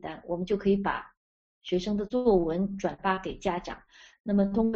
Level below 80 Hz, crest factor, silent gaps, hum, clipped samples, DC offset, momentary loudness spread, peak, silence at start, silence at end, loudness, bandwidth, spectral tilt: -50 dBFS; 18 dB; 1.17-1.61 s, 4.20-4.24 s; none; under 0.1%; under 0.1%; 12 LU; -10 dBFS; 0.05 s; 0 s; -29 LUFS; 7.6 kHz; -6 dB/octave